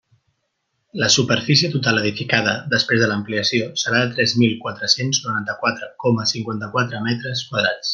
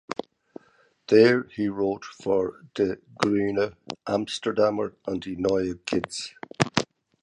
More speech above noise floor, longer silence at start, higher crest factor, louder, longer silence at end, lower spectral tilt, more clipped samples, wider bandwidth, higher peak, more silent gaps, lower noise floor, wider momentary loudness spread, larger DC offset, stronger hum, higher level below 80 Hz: first, 53 dB vs 37 dB; first, 0.95 s vs 0.1 s; second, 18 dB vs 26 dB; first, -19 LUFS vs -25 LUFS; second, 0 s vs 0.4 s; second, -3.5 dB/octave vs -5 dB/octave; neither; about the same, 10.5 kHz vs 11 kHz; about the same, -2 dBFS vs 0 dBFS; neither; first, -72 dBFS vs -62 dBFS; second, 8 LU vs 14 LU; neither; neither; about the same, -60 dBFS vs -58 dBFS